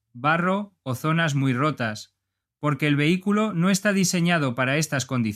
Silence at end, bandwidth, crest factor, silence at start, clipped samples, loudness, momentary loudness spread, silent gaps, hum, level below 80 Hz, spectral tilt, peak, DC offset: 0 s; 15.5 kHz; 16 dB; 0.15 s; under 0.1%; -23 LUFS; 8 LU; none; none; -66 dBFS; -5 dB/octave; -6 dBFS; under 0.1%